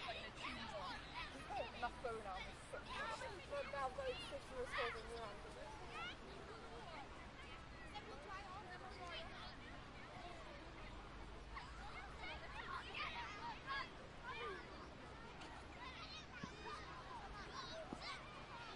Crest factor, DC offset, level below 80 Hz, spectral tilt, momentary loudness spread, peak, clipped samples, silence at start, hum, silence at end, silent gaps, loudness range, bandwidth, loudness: 20 dB; under 0.1%; -62 dBFS; -4 dB/octave; 9 LU; -32 dBFS; under 0.1%; 0 s; none; 0 s; none; 6 LU; 11.5 kHz; -51 LUFS